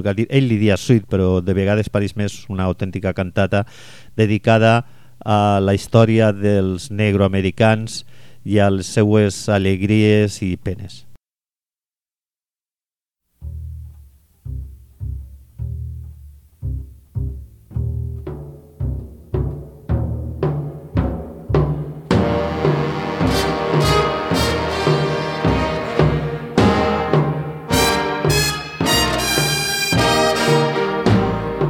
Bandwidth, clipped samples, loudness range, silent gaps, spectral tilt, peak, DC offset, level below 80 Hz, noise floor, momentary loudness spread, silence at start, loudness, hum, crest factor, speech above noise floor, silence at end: 18 kHz; under 0.1%; 16 LU; none; -5.5 dB/octave; 0 dBFS; under 0.1%; -34 dBFS; under -90 dBFS; 17 LU; 0 s; -18 LUFS; none; 18 dB; over 74 dB; 0 s